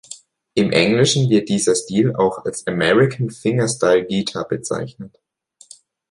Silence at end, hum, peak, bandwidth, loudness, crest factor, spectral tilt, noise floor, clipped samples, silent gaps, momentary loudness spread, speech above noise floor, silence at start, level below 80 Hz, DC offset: 1.05 s; none; -2 dBFS; 11.5 kHz; -18 LUFS; 18 dB; -5 dB/octave; -47 dBFS; under 0.1%; none; 11 LU; 30 dB; 0.1 s; -54 dBFS; under 0.1%